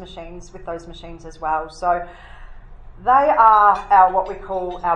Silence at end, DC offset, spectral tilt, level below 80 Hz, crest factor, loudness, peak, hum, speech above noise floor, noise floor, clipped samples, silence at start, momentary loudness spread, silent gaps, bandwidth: 0 s; under 0.1%; -5 dB/octave; -40 dBFS; 18 dB; -17 LUFS; 0 dBFS; none; 19 dB; -38 dBFS; under 0.1%; 0 s; 24 LU; none; 9.2 kHz